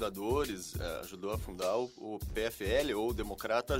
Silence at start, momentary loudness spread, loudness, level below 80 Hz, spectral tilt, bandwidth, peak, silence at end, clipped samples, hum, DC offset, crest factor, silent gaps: 0 s; 8 LU; -36 LUFS; -46 dBFS; -5 dB/octave; 16 kHz; -16 dBFS; 0 s; under 0.1%; none; under 0.1%; 18 dB; none